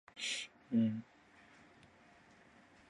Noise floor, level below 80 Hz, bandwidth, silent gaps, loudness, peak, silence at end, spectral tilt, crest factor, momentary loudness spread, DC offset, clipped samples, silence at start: -64 dBFS; -80 dBFS; 11.5 kHz; none; -38 LUFS; -24 dBFS; 1.85 s; -4 dB/octave; 18 dB; 25 LU; under 0.1%; under 0.1%; 0.15 s